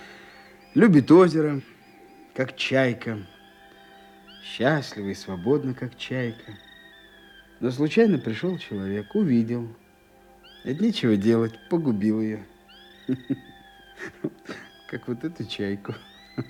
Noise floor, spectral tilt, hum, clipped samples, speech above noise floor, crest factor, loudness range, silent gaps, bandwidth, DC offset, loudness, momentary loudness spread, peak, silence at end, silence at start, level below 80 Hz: -55 dBFS; -7 dB/octave; none; under 0.1%; 32 dB; 20 dB; 11 LU; none; 12.5 kHz; under 0.1%; -24 LUFS; 19 LU; -4 dBFS; 0 s; 0 s; -64 dBFS